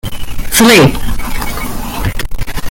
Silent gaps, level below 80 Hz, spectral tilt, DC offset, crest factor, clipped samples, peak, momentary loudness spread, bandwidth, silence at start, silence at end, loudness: none; -20 dBFS; -4 dB/octave; under 0.1%; 12 dB; 0.2%; 0 dBFS; 17 LU; 17.5 kHz; 0.05 s; 0 s; -12 LUFS